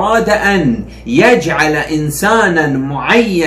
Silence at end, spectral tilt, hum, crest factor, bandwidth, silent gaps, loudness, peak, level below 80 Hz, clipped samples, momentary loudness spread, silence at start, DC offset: 0 s; -5 dB/octave; none; 12 dB; 15.5 kHz; none; -12 LUFS; 0 dBFS; -36 dBFS; under 0.1%; 7 LU; 0 s; under 0.1%